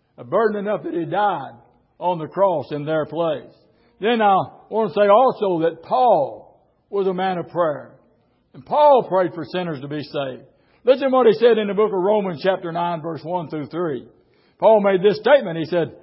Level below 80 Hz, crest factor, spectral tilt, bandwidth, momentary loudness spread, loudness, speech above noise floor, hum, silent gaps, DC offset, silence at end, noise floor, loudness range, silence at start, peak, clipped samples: -68 dBFS; 16 dB; -11 dB/octave; 5.8 kHz; 13 LU; -20 LUFS; 42 dB; none; none; under 0.1%; 0.1 s; -61 dBFS; 4 LU; 0.2 s; -4 dBFS; under 0.1%